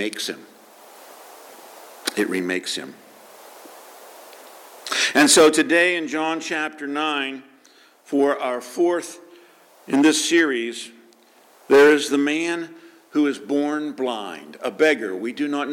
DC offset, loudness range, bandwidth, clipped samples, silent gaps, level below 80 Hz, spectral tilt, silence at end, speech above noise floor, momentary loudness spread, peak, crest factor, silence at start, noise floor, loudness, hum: under 0.1%; 11 LU; 17.5 kHz; under 0.1%; none; -70 dBFS; -2 dB/octave; 0 s; 33 dB; 17 LU; -6 dBFS; 18 dB; 0 s; -53 dBFS; -20 LUFS; none